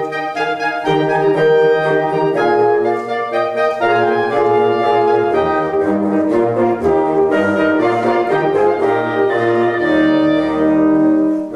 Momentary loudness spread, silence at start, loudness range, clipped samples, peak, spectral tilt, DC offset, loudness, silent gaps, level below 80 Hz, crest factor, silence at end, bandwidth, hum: 4 LU; 0 s; 1 LU; under 0.1%; -2 dBFS; -7 dB/octave; under 0.1%; -14 LUFS; none; -52 dBFS; 12 dB; 0 s; 10 kHz; none